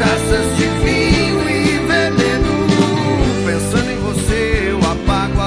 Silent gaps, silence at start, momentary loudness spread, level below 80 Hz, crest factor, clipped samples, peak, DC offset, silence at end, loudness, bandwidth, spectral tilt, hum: none; 0 s; 4 LU; -24 dBFS; 14 dB; under 0.1%; 0 dBFS; under 0.1%; 0 s; -15 LUFS; 11 kHz; -5 dB/octave; none